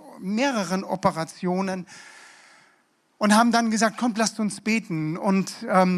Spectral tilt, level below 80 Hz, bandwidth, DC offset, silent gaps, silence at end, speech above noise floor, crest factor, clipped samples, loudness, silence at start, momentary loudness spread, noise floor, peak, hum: -5 dB/octave; -68 dBFS; 14 kHz; under 0.1%; none; 0 s; 41 dB; 20 dB; under 0.1%; -24 LUFS; 0.05 s; 10 LU; -64 dBFS; -4 dBFS; none